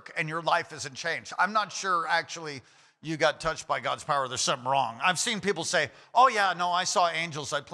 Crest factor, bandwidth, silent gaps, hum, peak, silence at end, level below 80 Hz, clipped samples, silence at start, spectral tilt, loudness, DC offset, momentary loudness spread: 18 dB; 14.5 kHz; none; none; -10 dBFS; 0 s; -64 dBFS; under 0.1%; 0.05 s; -2 dB/octave; -27 LUFS; under 0.1%; 9 LU